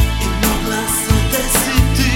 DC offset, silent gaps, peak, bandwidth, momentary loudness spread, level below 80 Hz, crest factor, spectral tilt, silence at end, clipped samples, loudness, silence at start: under 0.1%; none; 0 dBFS; 17 kHz; 3 LU; -20 dBFS; 14 dB; -4 dB/octave; 0 s; under 0.1%; -15 LUFS; 0 s